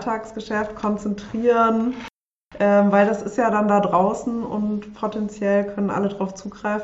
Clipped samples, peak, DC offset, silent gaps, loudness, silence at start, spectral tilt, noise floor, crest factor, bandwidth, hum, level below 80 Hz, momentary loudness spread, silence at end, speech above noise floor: under 0.1%; -4 dBFS; under 0.1%; 2.16-2.29 s, 2.35-2.46 s; -21 LUFS; 0 s; -7 dB/octave; -46 dBFS; 18 dB; 8 kHz; none; -54 dBFS; 11 LU; 0 s; 25 dB